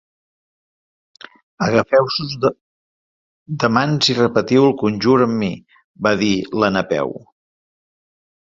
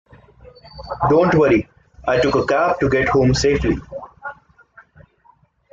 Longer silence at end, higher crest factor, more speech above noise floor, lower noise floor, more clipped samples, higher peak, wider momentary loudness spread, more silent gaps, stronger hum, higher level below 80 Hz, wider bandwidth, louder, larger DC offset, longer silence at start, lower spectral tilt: about the same, 1.35 s vs 1.4 s; about the same, 18 dB vs 16 dB; first, over 73 dB vs 40 dB; first, under -90 dBFS vs -56 dBFS; neither; about the same, -2 dBFS vs -4 dBFS; second, 8 LU vs 20 LU; first, 2.61-3.46 s, 5.84-5.95 s vs none; neither; second, -54 dBFS vs -38 dBFS; about the same, 7.8 kHz vs 7.8 kHz; about the same, -17 LUFS vs -17 LUFS; neither; first, 1.6 s vs 0.75 s; about the same, -5.5 dB/octave vs -6 dB/octave